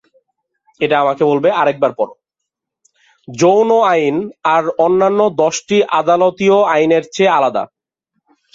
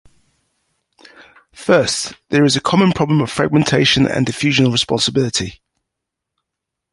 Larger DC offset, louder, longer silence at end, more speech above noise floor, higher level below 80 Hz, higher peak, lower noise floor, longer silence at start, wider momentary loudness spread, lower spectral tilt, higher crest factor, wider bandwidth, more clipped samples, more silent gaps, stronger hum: neither; about the same, -14 LUFS vs -15 LUFS; second, 0.9 s vs 1.4 s; about the same, 66 dB vs 65 dB; second, -60 dBFS vs -46 dBFS; about the same, -2 dBFS vs -2 dBFS; about the same, -79 dBFS vs -81 dBFS; second, 0.8 s vs 1.6 s; about the same, 7 LU vs 6 LU; about the same, -5 dB/octave vs -4.5 dB/octave; about the same, 14 dB vs 16 dB; second, 7.8 kHz vs 11.5 kHz; neither; neither; neither